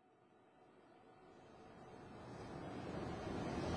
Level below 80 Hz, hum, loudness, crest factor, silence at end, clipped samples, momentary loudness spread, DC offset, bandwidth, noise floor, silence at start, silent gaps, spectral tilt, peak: -64 dBFS; none; -49 LUFS; 20 dB; 0 s; under 0.1%; 22 LU; under 0.1%; 11 kHz; -70 dBFS; 0 s; none; -6.5 dB/octave; -30 dBFS